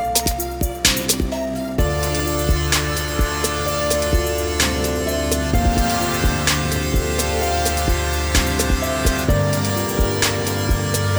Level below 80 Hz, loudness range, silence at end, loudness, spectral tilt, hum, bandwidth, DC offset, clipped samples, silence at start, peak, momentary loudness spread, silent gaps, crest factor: -24 dBFS; 1 LU; 0 s; -19 LUFS; -4 dB/octave; none; over 20 kHz; under 0.1%; under 0.1%; 0 s; 0 dBFS; 3 LU; none; 18 dB